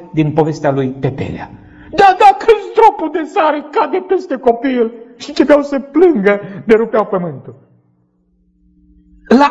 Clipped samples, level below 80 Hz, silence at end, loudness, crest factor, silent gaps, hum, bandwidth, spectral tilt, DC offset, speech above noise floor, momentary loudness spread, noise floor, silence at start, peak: 0.8%; -46 dBFS; 0 s; -13 LUFS; 14 dB; none; none; 10 kHz; -7 dB/octave; under 0.1%; 44 dB; 13 LU; -57 dBFS; 0 s; 0 dBFS